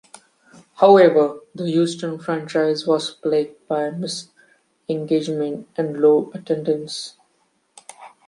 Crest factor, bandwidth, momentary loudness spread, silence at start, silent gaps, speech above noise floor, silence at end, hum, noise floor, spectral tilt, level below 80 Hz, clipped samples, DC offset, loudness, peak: 18 dB; 11.5 kHz; 15 LU; 0.8 s; none; 46 dB; 0.2 s; none; -65 dBFS; -5.5 dB/octave; -70 dBFS; under 0.1%; under 0.1%; -20 LUFS; -2 dBFS